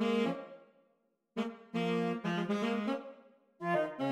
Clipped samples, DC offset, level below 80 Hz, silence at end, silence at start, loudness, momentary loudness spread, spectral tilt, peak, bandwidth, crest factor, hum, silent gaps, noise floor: under 0.1%; under 0.1%; -84 dBFS; 0 s; 0 s; -36 LUFS; 10 LU; -6.5 dB/octave; -20 dBFS; 11.5 kHz; 16 dB; none; none; -76 dBFS